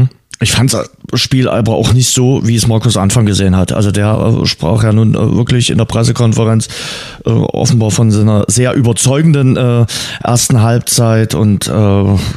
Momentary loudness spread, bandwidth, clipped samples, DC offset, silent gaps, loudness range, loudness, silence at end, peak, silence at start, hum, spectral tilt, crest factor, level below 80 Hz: 5 LU; 14 kHz; under 0.1%; under 0.1%; none; 1 LU; -11 LUFS; 0 s; 0 dBFS; 0 s; none; -5 dB/octave; 10 dB; -34 dBFS